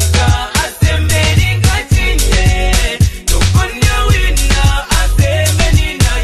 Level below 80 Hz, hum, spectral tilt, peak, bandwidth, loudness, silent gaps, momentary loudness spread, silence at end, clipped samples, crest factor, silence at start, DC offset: -14 dBFS; none; -4 dB/octave; 0 dBFS; 13 kHz; -12 LUFS; none; 2 LU; 0 s; under 0.1%; 10 dB; 0 s; under 0.1%